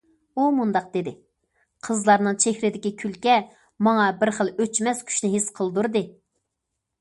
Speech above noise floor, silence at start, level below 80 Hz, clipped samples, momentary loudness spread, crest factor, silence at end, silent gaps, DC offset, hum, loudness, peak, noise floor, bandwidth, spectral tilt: 58 dB; 0.35 s; -68 dBFS; under 0.1%; 10 LU; 20 dB; 0.9 s; none; under 0.1%; none; -23 LUFS; -4 dBFS; -81 dBFS; 11.5 kHz; -4 dB/octave